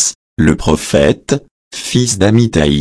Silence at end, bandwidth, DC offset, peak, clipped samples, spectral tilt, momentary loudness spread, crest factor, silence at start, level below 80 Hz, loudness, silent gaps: 0 s; 11 kHz; under 0.1%; 0 dBFS; under 0.1%; -5 dB/octave; 8 LU; 12 dB; 0 s; -30 dBFS; -13 LUFS; 0.15-0.37 s, 1.51-1.71 s